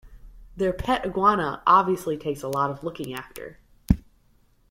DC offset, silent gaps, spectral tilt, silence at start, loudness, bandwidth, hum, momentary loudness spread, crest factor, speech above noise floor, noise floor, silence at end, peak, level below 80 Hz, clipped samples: under 0.1%; none; -6.5 dB/octave; 0.05 s; -24 LUFS; 16.5 kHz; none; 16 LU; 22 dB; 36 dB; -60 dBFS; 0.7 s; -4 dBFS; -40 dBFS; under 0.1%